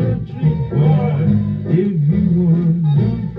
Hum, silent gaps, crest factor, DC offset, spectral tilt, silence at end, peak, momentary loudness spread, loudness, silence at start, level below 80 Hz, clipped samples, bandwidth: none; none; 12 dB; under 0.1%; -12 dB/octave; 0 s; -4 dBFS; 4 LU; -16 LUFS; 0 s; -38 dBFS; under 0.1%; 4 kHz